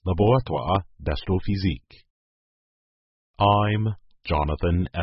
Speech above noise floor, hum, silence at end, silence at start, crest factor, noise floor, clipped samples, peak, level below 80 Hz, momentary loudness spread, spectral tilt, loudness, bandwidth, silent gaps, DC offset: over 68 dB; none; 0 s; 0.05 s; 20 dB; under -90 dBFS; under 0.1%; -6 dBFS; -34 dBFS; 10 LU; -11.5 dB/octave; -24 LUFS; 5.8 kHz; 2.10-3.34 s; under 0.1%